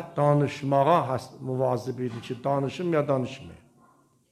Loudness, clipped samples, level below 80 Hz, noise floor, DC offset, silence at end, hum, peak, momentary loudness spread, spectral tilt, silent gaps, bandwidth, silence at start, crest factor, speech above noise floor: -26 LUFS; under 0.1%; -66 dBFS; -61 dBFS; under 0.1%; 0.75 s; none; -8 dBFS; 11 LU; -7.5 dB/octave; none; 13.5 kHz; 0 s; 18 dB; 36 dB